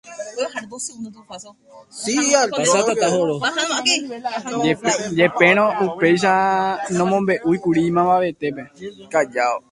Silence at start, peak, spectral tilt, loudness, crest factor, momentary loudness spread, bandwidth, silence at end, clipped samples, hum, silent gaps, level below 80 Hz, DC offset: 0.05 s; 0 dBFS; -3.5 dB/octave; -18 LUFS; 20 dB; 16 LU; 11.5 kHz; 0.15 s; under 0.1%; none; none; -60 dBFS; under 0.1%